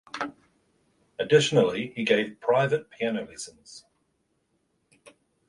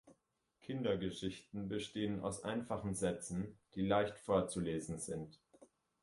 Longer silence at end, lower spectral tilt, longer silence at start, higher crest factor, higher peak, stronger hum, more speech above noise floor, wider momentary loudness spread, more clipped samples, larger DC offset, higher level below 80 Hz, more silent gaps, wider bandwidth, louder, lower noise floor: first, 1.7 s vs 0.4 s; about the same, -4.5 dB/octave vs -5.5 dB/octave; about the same, 0.15 s vs 0.05 s; about the same, 20 dB vs 20 dB; first, -8 dBFS vs -20 dBFS; neither; first, 48 dB vs 40 dB; first, 19 LU vs 11 LU; neither; neither; about the same, -68 dBFS vs -64 dBFS; neither; about the same, 11.5 kHz vs 11.5 kHz; first, -25 LUFS vs -40 LUFS; second, -73 dBFS vs -80 dBFS